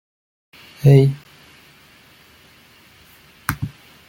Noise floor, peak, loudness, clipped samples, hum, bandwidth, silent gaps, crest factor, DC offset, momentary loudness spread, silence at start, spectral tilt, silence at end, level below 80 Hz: -50 dBFS; -2 dBFS; -17 LUFS; under 0.1%; none; 17 kHz; none; 20 dB; under 0.1%; 19 LU; 0.85 s; -8 dB/octave; 0.4 s; -50 dBFS